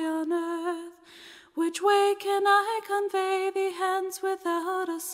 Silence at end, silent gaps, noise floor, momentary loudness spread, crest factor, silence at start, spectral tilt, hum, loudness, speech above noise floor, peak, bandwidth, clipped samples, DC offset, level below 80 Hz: 0 s; none; -50 dBFS; 13 LU; 16 dB; 0 s; -1 dB/octave; none; -27 LUFS; 24 dB; -12 dBFS; 16 kHz; under 0.1%; under 0.1%; -80 dBFS